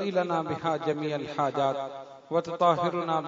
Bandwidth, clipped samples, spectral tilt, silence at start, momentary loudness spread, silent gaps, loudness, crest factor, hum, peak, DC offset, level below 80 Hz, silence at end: 7.8 kHz; under 0.1%; -6.5 dB/octave; 0 s; 7 LU; none; -28 LUFS; 20 dB; none; -8 dBFS; under 0.1%; -72 dBFS; 0 s